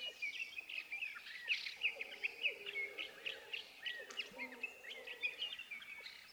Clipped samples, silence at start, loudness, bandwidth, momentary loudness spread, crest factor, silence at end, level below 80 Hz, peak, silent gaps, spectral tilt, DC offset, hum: under 0.1%; 0 s; -43 LUFS; over 20 kHz; 8 LU; 20 dB; 0 s; -86 dBFS; -26 dBFS; none; 0 dB/octave; under 0.1%; none